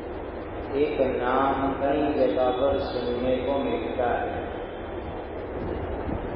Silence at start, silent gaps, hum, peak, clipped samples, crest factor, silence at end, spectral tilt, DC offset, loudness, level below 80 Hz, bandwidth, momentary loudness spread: 0 s; none; none; -10 dBFS; under 0.1%; 16 dB; 0 s; -10.5 dB/octave; under 0.1%; -27 LUFS; -42 dBFS; 5.6 kHz; 11 LU